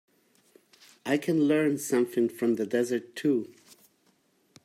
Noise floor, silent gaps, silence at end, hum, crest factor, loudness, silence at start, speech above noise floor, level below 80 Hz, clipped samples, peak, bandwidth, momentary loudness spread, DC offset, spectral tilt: -68 dBFS; none; 1.2 s; none; 16 dB; -27 LUFS; 1.05 s; 42 dB; -78 dBFS; under 0.1%; -12 dBFS; 15.5 kHz; 6 LU; under 0.1%; -5.5 dB/octave